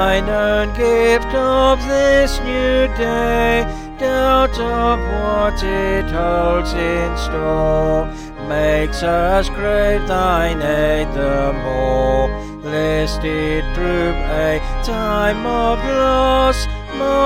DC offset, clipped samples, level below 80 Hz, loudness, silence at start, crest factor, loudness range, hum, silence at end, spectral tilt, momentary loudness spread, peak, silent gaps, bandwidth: under 0.1%; under 0.1%; -24 dBFS; -17 LUFS; 0 s; 14 dB; 3 LU; none; 0 s; -5.5 dB/octave; 6 LU; -2 dBFS; none; 16 kHz